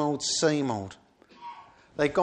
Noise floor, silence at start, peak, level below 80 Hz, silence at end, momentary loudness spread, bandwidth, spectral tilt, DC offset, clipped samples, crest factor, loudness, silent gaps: -48 dBFS; 0 s; -10 dBFS; -64 dBFS; 0 s; 21 LU; 10 kHz; -4 dB/octave; under 0.1%; under 0.1%; 20 dB; -27 LUFS; none